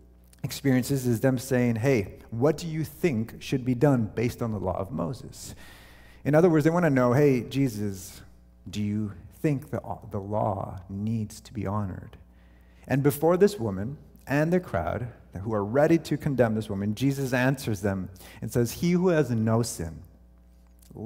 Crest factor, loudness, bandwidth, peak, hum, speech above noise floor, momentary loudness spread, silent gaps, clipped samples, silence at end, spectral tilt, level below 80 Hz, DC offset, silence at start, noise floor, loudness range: 20 dB; -26 LUFS; 16 kHz; -8 dBFS; none; 28 dB; 14 LU; none; under 0.1%; 0 s; -7 dB/octave; -52 dBFS; under 0.1%; 0.45 s; -54 dBFS; 6 LU